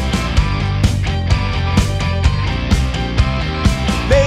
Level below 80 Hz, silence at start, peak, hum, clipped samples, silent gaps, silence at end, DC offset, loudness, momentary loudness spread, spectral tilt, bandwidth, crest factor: -20 dBFS; 0 s; 0 dBFS; none; under 0.1%; none; 0 s; under 0.1%; -17 LUFS; 2 LU; -6 dB/octave; 13.5 kHz; 14 dB